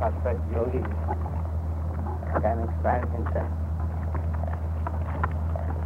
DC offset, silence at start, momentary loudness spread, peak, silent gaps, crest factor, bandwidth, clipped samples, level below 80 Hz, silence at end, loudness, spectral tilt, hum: under 0.1%; 0 s; 4 LU; -12 dBFS; none; 16 dB; 3.2 kHz; under 0.1%; -32 dBFS; 0 s; -29 LUFS; -10 dB/octave; none